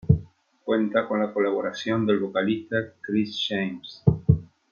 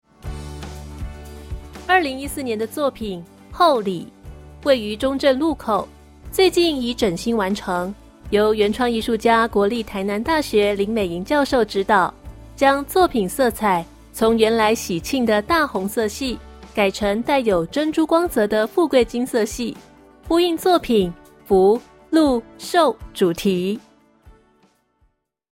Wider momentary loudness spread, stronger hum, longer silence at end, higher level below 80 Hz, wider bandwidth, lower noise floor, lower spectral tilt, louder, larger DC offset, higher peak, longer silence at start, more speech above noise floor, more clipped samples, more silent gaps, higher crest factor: second, 5 LU vs 16 LU; neither; second, 0.25 s vs 1.25 s; about the same, -46 dBFS vs -42 dBFS; second, 7 kHz vs 16.5 kHz; second, -47 dBFS vs -64 dBFS; first, -7.5 dB/octave vs -4.5 dB/octave; second, -25 LUFS vs -19 LUFS; neither; about the same, -4 dBFS vs -2 dBFS; second, 0.05 s vs 0.25 s; second, 21 dB vs 46 dB; neither; neither; about the same, 20 dB vs 18 dB